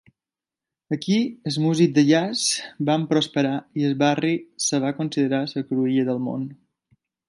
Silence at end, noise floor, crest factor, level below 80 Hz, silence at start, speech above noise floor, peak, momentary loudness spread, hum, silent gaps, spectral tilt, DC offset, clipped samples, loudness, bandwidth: 0.75 s; -90 dBFS; 18 dB; -70 dBFS; 0.9 s; 68 dB; -6 dBFS; 8 LU; none; none; -5 dB/octave; under 0.1%; under 0.1%; -22 LUFS; 11.5 kHz